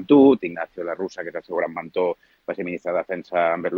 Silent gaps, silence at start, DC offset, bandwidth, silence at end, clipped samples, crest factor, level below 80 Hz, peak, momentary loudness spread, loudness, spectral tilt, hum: none; 0 s; under 0.1%; 6.6 kHz; 0 s; under 0.1%; 18 dB; -66 dBFS; -4 dBFS; 14 LU; -23 LUFS; -7.5 dB/octave; none